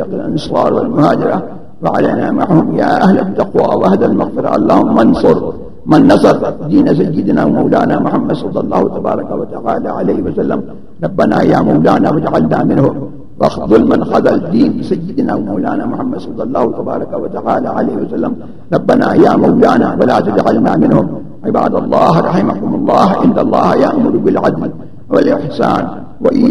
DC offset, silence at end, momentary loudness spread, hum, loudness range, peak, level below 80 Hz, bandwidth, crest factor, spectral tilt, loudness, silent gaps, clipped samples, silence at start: 4%; 0 s; 10 LU; none; 5 LU; 0 dBFS; -40 dBFS; 11 kHz; 12 dB; -8.5 dB/octave; -12 LUFS; none; 0.2%; 0 s